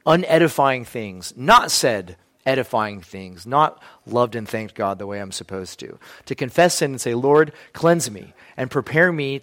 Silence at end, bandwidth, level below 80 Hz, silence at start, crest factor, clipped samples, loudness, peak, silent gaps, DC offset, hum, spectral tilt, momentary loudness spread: 0 s; 16.5 kHz; -54 dBFS; 0.05 s; 18 dB; under 0.1%; -20 LUFS; -2 dBFS; none; under 0.1%; none; -4 dB/octave; 17 LU